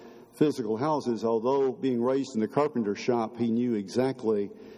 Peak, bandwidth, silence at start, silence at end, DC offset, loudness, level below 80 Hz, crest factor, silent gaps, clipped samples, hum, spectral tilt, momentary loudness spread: -10 dBFS; 13 kHz; 0 s; 0 s; under 0.1%; -28 LUFS; -72 dBFS; 16 dB; none; under 0.1%; none; -7 dB/octave; 2 LU